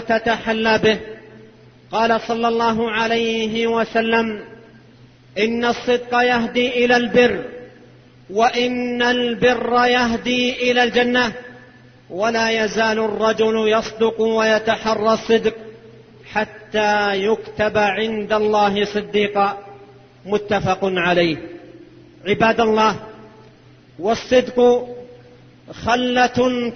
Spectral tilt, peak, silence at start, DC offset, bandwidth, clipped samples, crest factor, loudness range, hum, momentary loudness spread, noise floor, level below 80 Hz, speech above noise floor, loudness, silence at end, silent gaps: -4.5 dB/octave; -2 dBFS; 0 s; under 0.1%; 6.6 kHz; under 0.1%; 16 dB; 3 LU; none; 10 LU; -47 dBFS; -50 dBFS; 30 dB; -18 LUFS; 0 s; none